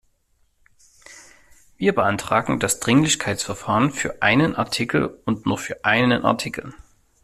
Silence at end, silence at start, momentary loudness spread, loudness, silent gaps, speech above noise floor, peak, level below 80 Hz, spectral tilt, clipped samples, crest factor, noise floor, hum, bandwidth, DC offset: 0.5 s; 1.1 s; 8 LU; -21 LUFS; none; 43 dB; -2 dBFS; -52 dBFS; -4 dB/octave; under 0.1%; 20 dB; -64 dBFS; none; 15 kHz; under 0.1%